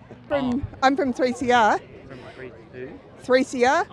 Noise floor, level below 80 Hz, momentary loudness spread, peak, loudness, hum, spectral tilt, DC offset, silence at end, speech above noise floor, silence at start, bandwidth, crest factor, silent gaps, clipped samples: -41 dBFS; -50 dBFS; 21 LU; -4 dBFS; -22 LUFS; none; -4.5 dB/octave; under 0.1%; 0.05 s; 20 dB; 0.1 s; 11 kHz; 20 dB; none; under 0.1%